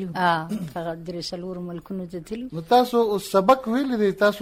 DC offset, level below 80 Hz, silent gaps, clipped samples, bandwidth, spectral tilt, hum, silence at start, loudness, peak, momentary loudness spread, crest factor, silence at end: under 0.1%; -56 dBFS; none; under 0.1%; 16 kHz; -5.5 dB/octave; none; 0 s; -23 LUFS; -6 dBFS; 14 LU; 18 dB; 0 s